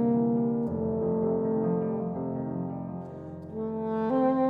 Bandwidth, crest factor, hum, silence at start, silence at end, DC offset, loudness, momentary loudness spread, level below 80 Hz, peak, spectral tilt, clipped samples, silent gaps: 4.1 kHz; 14 dB; none; 0 s; 0 s; under 0.1%; -29 LUFS; 12 LU; -60 dBFS; -14 dBFS; -11.5 dB/octave; under 0.1%; none